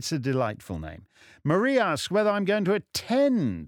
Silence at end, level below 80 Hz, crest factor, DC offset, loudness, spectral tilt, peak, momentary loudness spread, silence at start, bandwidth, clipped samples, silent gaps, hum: 0 s; -54 dBFS; 16 dB; under 0.1%; -25 LUFS; -5.5 dB/octave; -10 dBFS; 13 LU; 0 s; 18 kHz; under 0.1%; none; none